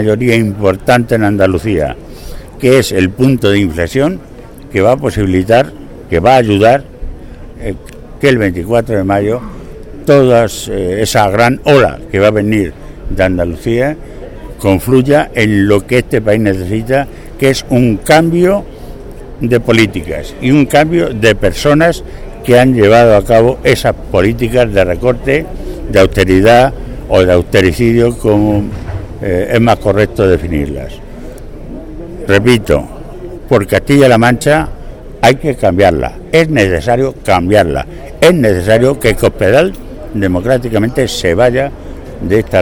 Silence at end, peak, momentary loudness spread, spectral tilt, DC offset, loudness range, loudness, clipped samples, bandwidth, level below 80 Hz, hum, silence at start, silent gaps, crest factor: 0 s; 0 dBFS; 19 LU; -6 dB/octave; under 0.1%; 4 LU; -10 LUFS; 0.4%; 18.5 kHz; -28 dBFS; none; 0 s; none; 10 dB